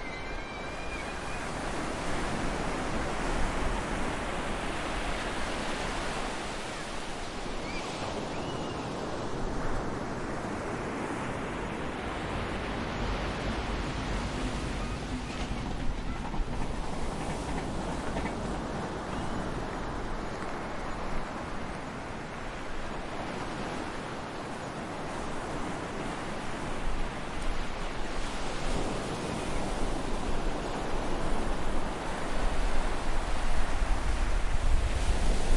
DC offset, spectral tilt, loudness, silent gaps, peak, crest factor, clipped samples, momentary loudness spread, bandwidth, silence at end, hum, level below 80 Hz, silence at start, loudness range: under 0.1%; -5 dB/octave; -35 LUFS; none; -12 dBFS; 18 dB; under 0.1%; 5 LU; 11.5 kHz; 0 s; none; -36 dBFS; 0 s; 4 LU